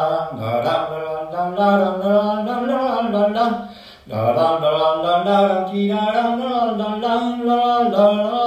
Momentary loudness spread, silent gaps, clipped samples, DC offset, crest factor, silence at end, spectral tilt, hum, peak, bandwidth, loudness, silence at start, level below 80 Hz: 7 LU; none; under 0.1%; under 0.1%; 16 dB; 0 s; -7 dB/octave; none; -2 dBFS; 14 kHz; -18 LUFS; 0 s; -58 dBFS